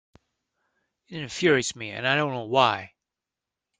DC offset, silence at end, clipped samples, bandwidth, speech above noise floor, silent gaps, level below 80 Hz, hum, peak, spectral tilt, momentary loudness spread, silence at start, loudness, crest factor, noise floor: under 0.1%; 0.95 s; under 0.1%; 9.6 kHz; 63 dB; none; -66 dBFS; none; -4 dBFS; -4 dB/octave; 13 LU; 1.1 s; -24 LUFS; 24 dB; -88 dBFS